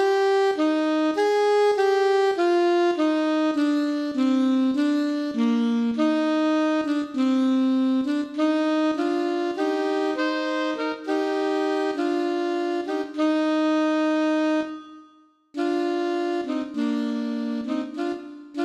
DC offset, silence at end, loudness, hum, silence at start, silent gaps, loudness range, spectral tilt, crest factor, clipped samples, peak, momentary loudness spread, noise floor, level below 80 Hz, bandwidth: under 0.1%; 0 s; -23 LUFS; none; 0 s; none; 5 LU; -4.5 dB/octave; 12 dB; under 0.1%; -12 dBFS; 7 LU; -56 dBFS; -72 dBFS; 9.8 kHz